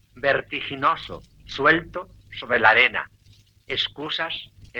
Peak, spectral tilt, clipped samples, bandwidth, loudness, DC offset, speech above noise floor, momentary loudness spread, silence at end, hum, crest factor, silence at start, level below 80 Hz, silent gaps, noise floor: -2 dBFS; -4.5 dB/octave; under 0.1%; 19 kHz; -21 LUFS; under 0.1%; 32 dB; 20 LU; 0 s; none; 22 dB; 0.15 s; -54 dBFS; none; -55 dBFS